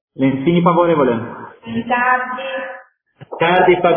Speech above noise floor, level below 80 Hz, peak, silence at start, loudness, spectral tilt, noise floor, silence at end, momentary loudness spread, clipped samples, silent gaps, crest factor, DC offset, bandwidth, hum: 29 dB; -52 dBFS; 0 dBFS; 0.15 s; -16 LUFS; -10.5 dB/octave; -44 dBFS; 0 s; 18 LU; under 0.1%; none; 16 dB; under 0.1%; 3.6 kHz; none